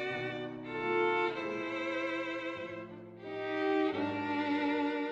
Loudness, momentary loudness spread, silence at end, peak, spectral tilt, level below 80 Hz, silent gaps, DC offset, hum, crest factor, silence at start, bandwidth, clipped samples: -34 LUFS; 11 LU; 0 s; -20 dBFS; -6 dB/octave; -74 dBFS; none; under 0.1%; none; 16 dB; 0 s; 8 kHz; under 0.1%